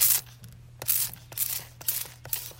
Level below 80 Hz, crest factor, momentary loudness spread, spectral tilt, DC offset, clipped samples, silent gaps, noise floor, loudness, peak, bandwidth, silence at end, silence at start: -60 dBFS; 24 dB; 8 LU; 0 dB/octave; under 0.1%; under 0.1%; none; -48 dBFS; -28 LUFS; -6 dBFS; 16.5 kHz; 0 s; 0 s